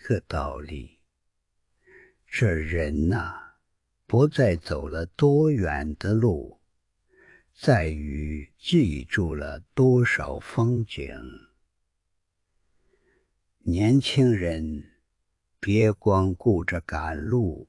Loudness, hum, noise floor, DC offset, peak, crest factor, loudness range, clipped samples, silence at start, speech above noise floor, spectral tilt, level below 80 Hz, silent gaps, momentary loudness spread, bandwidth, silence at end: -25 LUFS; none; -76 dBFS; under 0.1%; -6 dBFS; 20 dB; 6 LU; under 0.1%; 0.05 s; 52 dB; -7.5 dB/octave; -44 dBFS; none; 14 LU; 11.5 kHz; 0.05 s